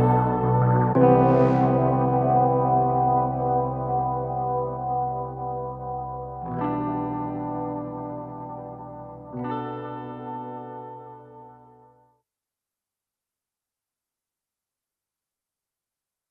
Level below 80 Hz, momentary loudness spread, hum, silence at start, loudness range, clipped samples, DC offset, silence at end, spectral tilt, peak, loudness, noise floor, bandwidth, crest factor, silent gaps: -50 dBFS; 18 LU; none; 0 s; 18 LU; under 0.1%; under 0.1%; 4.75 s; -11.5 dB/octave; -6 dBFS; -24 LUFS; -89 dBFS; 3.8 kHz; 20 dB; none